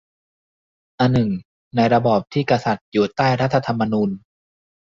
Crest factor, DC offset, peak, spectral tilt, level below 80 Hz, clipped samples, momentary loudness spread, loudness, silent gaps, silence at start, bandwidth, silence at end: 18 dB; under 0.1%; -4 dBFS; -7.5 dB/octave; -52 dBFS; under 0.1%; 7 LU; -20 LUFS; 1.45-1.71 s, 2.81-2.92 s; 1 s; 7.6 kHz; 0.75 s